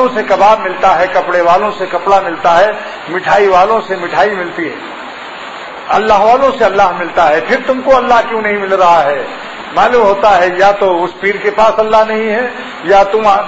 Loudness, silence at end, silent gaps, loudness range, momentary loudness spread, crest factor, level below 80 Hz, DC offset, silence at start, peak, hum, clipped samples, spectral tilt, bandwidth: -10 LUFS; 0 s; none; 3 LU; 12 LU; 10 dB; -42 dBFS; under 0.1%; 0 s; 0 dBFS; none; under 0.1%; -4.5 dB/octave; 8 kHz